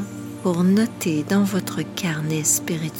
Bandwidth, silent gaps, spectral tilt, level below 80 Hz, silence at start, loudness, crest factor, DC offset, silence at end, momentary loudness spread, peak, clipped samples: 17 kHz; none; -4.5 dB/octave; -62 dBFS; 0 s; -21 LUFS; 16 dB; under 0.1%; 0 s; 8 LU; -6 dBFS; under 0.1%